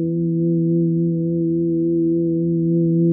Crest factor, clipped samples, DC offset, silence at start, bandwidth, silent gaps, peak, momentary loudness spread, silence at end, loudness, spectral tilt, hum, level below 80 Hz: 8 dB; under 0.1%; under 0.1%; 0 s; 0.6 kHz; none; -10 dBFS; 2 LU; 0 s; -19 LUFS; -22.5 dB/octave; none; -54 dBFS